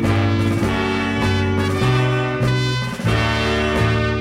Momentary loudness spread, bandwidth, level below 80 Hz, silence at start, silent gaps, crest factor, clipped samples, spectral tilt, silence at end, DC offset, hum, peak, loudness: 2 LU; 15 kHz; -32 dBFS; 0 s; none; 12 dB; under 0.1%; -6 dB/octave; 0 s; under 0.1%; none; -6 dBFS; -19 LUFS